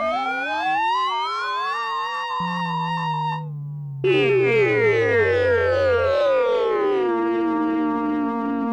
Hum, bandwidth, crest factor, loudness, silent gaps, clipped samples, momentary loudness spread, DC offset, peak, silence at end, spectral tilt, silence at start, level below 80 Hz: none; 9.8 kHz; 12 dB; -21 LUFS; none; under 0.1%; 7 LU; under 0.1%; -8 dBFS; 0 s; -6.5 dB/octave; 0 s; -54 dBFS